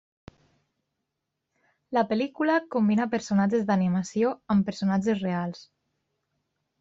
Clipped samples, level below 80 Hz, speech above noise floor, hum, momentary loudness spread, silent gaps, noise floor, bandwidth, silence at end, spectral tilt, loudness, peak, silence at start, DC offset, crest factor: under 0.1%; -64 dBFS; 58 dB; none; 6 LU; none; -83 dBFS; 7.8 kHz; 1.15 s; -7 dB/octave; -26 LUFS; -12 dBFS; 1.9 s; under 0.1%; 16 dB